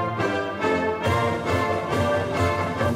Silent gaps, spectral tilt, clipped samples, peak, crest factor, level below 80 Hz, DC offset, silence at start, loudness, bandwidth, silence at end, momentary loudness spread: none; -6 dB/octave; under 0.1%; -8 dBFS; 14 dB; -48 dBFS; under 0.1%; 0 s; -23 LUFS; 16 kHz; 0 s; 2 LU